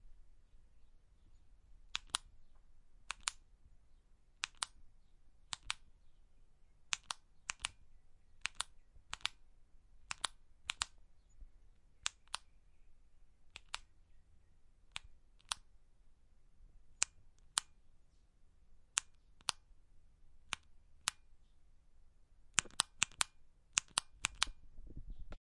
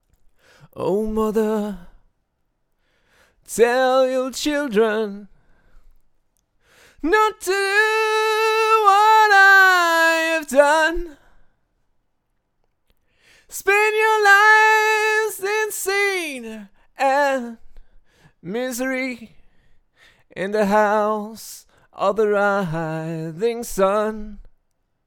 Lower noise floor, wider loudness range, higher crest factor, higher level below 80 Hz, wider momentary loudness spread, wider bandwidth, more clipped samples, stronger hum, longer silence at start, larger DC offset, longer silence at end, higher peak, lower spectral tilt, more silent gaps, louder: second, -65 dBFS vs -70 dBFS; about the same, 11 LU vs 11 LU; first, 42 dB vs 20 dB; second, -62 dBFS vs -46 dBFS; second, 13 LU vs 18 LU; second, 11.5 kHz vs 19 kHz; neither; neither; second, 0 s vs 0.75 s; neither; second, 0.15 s vs 0.65 s; second, -6 dBFS vs 0 dBFS; second, 1 dB/octave vs -3.5 dB/octave; neither; second, -42 LUFS vs -17 LUFS